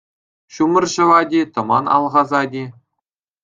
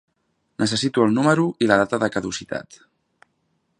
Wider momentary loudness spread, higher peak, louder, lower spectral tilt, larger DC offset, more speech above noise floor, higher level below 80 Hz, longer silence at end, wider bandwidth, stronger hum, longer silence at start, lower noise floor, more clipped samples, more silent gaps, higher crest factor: about the same, 10 LU vs 11 LU; about the same, -2 dBFS vs 0 dBFS; first, -16 LUFS vs -20 LUFS; about the same, -5 dB/octave vs -5 dB/octave; neither; first, 64 dB vs 50 dB; second, -64 dBFS vs -58 dBFS; second, 0.75 s vs 1.15 s; second, 7.8 kHz vs 11 kHz; neither; about the same, 0.55 s vs 0.6 s; first, -79 dBFS vs -71 dBFS; neither; neither; second, 16 dB vs 22 dB